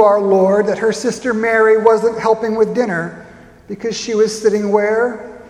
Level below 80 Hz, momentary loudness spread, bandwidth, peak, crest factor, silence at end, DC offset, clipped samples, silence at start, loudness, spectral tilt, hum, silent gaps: -54 dBFS; 11 LU; 11.5 kHz; 0 dBFS; 14 dB; 0 s; under 0.1%; under 0.1%; 0 s; -15 LUFS; -5 dB/octave; none; none